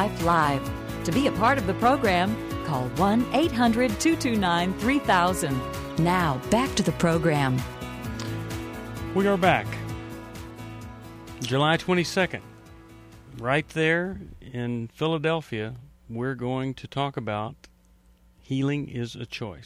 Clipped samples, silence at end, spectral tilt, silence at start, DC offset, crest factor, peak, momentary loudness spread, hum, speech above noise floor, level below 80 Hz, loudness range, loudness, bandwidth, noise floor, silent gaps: under 0.1%; 0 s; -5.5 dB/octave; 0 s; under 0.1%; 20 dB; -6 dBFS; 15 LU; none; 33 dB; -46 dBFS; 7 LU; -25 LUFS; 16 kHz; -58 dBFS; none